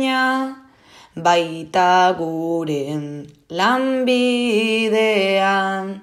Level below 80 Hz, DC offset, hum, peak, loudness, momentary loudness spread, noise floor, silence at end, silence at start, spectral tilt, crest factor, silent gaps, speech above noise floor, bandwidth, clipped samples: -66 dBFS; under 0.1%; none; -2 dBFS; -18 LUFS; 12 LU; -48 dBFS; 0 s; 0 s; -4.5 dB/octave; 16 dB; none; 30 dB; 15.5 kHz; under 0.1%